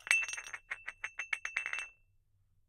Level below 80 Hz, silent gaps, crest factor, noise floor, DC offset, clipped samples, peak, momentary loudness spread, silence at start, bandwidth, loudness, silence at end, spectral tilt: -72 dBFS; none; 32 dB; -71 dBFS; under 0.1%; under 0.1%; -8 dBFS; 13 LU; 0.05 s; 16 kHz; -37 LUFS; 0.75 s; 2.5 dB/octave